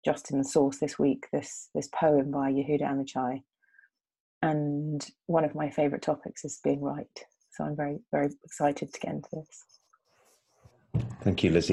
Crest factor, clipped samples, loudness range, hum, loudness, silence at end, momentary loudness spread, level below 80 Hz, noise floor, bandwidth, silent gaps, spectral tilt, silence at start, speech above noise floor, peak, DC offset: 20 dB; under 0.1%; 6 LU; none; -30 LUFS; 0 s; 12 LU; -58 dBFS; -68 dBFS; 12 kHz; 4.20-4.41 s; -6 dB/octave; 0.05 s; 39 dB; -10 dBFS; under 0.1%